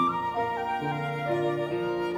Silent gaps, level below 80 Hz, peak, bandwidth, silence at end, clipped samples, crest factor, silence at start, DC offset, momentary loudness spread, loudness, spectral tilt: none; -62 dBFS; -14 dBFS; over 20 kHz; 0 s; under 0.1%; 14 dB; 0 s; under 0.1%; 2 LU; -29 LUFS; -7 dB/octave